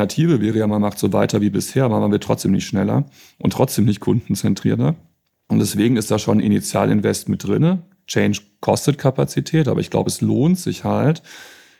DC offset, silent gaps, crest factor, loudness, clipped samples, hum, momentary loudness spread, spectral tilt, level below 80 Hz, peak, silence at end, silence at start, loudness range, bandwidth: under 0.1%; none; 16 dB; -19 LUFS; under 0.1%; none; 5 LU; -6.5 dB/octave; -54 dBFS; -2 dBFS; 0.3 s; 0 s; 1 LU; 16 kHz